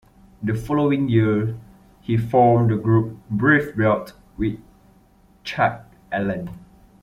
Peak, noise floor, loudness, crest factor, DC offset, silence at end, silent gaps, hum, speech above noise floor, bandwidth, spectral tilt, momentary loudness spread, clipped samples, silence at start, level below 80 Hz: -4 dBFS; -54 dBFS; -21 LUFS; 18 dB; under 0.1%; 0.45 s; none; none; 35 dB; 12.5 kHz; -8.5 dB/octave; 19 LU; under 0.1%; 0.4 s; -48 dBFS